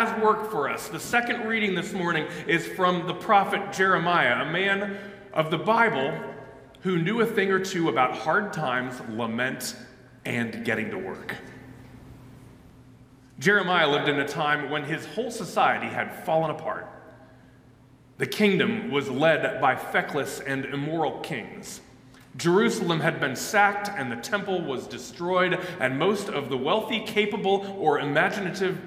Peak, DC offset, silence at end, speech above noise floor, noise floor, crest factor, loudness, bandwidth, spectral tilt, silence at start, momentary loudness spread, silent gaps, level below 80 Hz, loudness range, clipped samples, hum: -6 dBFS; under 0.1%; 0 s; 29 dB; -54 dBFS; 20 dB; -25 LUFS; 16 kHz; -4.5 dB/octave; 0 s; 12 LU; none; -64 dBFS; 5 LU; under 0.1%; none